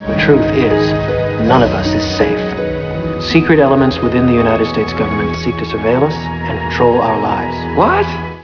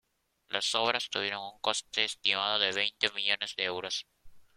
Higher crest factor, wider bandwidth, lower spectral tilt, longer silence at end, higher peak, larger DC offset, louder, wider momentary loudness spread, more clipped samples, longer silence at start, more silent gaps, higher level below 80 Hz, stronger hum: second, 14 dB vs 26 dB; second, 5.4 kHz vs 16.5 kHz; first, -7 dB/octave vs -0.5 dB/octave; second, 0 s vs 0.15 s; first, 0 dBFS vs -8 dBFS; first, 0.2% vs under 0.1%; first, -13 LUFS vs -30 LUFS; about the same, 8 LU vs 7 LU; neither; second, 0 s vs 0.5 s; neither; first, -32 dBFS vs -70 dBFS; neither